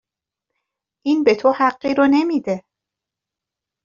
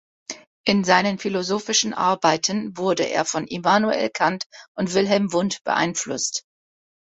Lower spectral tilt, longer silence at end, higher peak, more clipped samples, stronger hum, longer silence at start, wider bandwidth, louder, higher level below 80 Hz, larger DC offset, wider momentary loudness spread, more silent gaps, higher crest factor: about the same, -4 dB/octave vs -3.5 dB/octave; first, 1.25 s vs 0.8 s; about the same, -2 dBFS vs -2 dBFS; neither; neither; first, 1.05 s vs 0.3 s; second, 7.2 kHz vs 8.2 kHz; first, -18 LUFS vs -21 LUFS; about the same, -62 dBFS vs -62 dBFS; neither; about the same, 11 LU vs 9 LU; second, none vs 0.47-0.64 s, 4.46-4.50 s, 4.68-4.75 s; about the same, 18 dB vs 20 dB